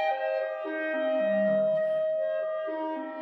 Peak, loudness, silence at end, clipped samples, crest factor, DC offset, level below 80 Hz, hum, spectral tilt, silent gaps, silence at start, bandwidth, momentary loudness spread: -16 dBFS; -28 LUFS; 0 s; under 0.1%; 12 dB; under 0.1%; -86 dBFS; none; -8 dB/octave; none; 0 s; 4.7 kHz; 7 LU